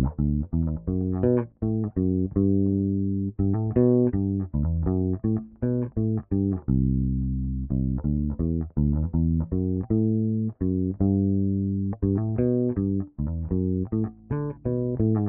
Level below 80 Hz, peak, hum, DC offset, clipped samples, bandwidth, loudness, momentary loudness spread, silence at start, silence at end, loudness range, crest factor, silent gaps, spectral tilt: -36 dBFS; -8 dBFS; none; under 0.1%; under 0.1%; 2.5 kHz; -26 LUFS; 5 LU; 0 s; 0 s; 2 LU; 16 dB; none; -15 dB/octave